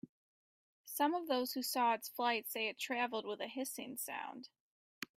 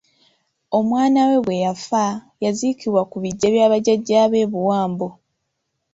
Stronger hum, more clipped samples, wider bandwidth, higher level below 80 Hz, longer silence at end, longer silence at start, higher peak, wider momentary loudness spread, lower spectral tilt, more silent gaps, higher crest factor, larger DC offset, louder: neither; neither; first, 16 kHz vs 8 kHz; second, -90 dBFS vs -60 dBFS; second, 0.1 s vs 0.8 s; second, 0.05 s vs 0.7 s; second, -22 dBFS vs -4 dBFS; first, 12 LU vs 8 LU; second, -1.5 dB/octave vs -5.5 dB/octave; first, 0.09-0.84 s, 4.60-5.01 s vs none; about the same, 18 dB vs 16 dB; neither; second, -38 LUFS vs -19 LUFS